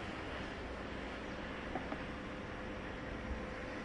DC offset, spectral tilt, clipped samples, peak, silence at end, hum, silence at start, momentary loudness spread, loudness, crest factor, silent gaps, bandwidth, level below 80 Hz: under 0.1%; -6 dB/octave; under 0.1%; -26 dBFS; 0 s; none; 0 s; 2 LU; -44 LUFS; 16 dB; none; 11 kHz; -52 dBFS